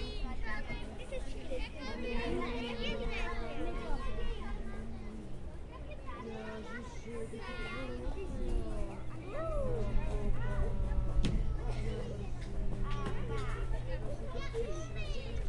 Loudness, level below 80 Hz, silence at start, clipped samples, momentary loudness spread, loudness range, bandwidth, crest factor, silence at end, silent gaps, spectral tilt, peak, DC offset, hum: -41 LUFS; -38 dBFS; 0 s; under 0.1%; 8 LU; 6 LU; 10.5 kHz; 18 dB; 0 s; none; -6.5 dB/octave; -18 dBFS; under 0.1%; none